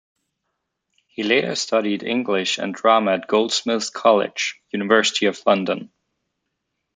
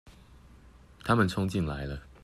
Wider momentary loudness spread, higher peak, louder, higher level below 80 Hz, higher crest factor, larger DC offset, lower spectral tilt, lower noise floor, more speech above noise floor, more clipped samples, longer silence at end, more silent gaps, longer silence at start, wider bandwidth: second, 8 LU vs 13 LU; first, -2 dBFS vs -12 dBFS; first, -20 LUFS vs -30 LUFS; second, -70 dBFS vs -48 dBFS; about the same, 20 dB vs 20 dB; neither; second, -3 dB/octave vs -6.5 dB/octave; first, -77 dBFS vs -54 dBFS; first, 57 dB vs 26 dB; neither; first, 1.1 s vs 0.15 s; neither; first, 1.2 s vs 0.05 s; second, 9.6 kHz vs 14 kHz